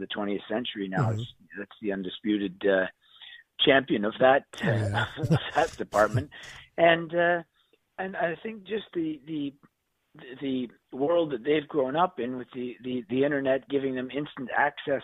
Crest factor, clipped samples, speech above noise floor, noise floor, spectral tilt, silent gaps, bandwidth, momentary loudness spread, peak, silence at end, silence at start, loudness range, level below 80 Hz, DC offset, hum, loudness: 22 dB; under 0.1%; 28 dB; -56 dBFS; -6.5 dB/octave; none; 14.5 kHz; 15 LU; -6 dBFS; 0 s; 0 s; 7 LU; -60 dBFS; under 0.1%; none; -28 LUFS